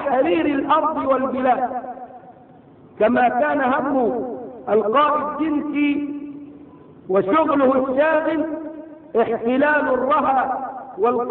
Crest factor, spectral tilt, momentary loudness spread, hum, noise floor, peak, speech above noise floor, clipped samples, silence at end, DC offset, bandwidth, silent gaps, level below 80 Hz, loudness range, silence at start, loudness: 14 dB; -9.5 dB/octave; 14 LU; none; -46 dBFS; -6 dBFS; 28 dB; under 0.1%; 0 s; under 0.1%; 4.2 kHz; none; -58 dBFS; 2 LU; 0 s; -19 LUFS